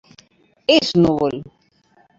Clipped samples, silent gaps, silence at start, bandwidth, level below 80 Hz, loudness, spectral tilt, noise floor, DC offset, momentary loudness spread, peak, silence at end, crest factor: under 0.1%; none; 0.7 s; 7.8 kHz; -50 dBFS; -17 LUFS; -5.5 dB/octave; -57 dBFS; under 0.1%; 11 LU; -2 dBFS; 0.75 s; 18 dB